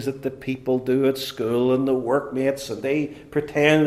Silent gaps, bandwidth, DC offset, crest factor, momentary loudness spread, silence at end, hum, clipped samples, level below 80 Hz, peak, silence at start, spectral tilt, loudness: none; 15.5 kHz; under 0.1%; 20 dB; 8 LU; 0 s; none; under 0.1%; -56 dBFS; -2 dBFS; 0 s; -6 dB/octave; -23 LUFS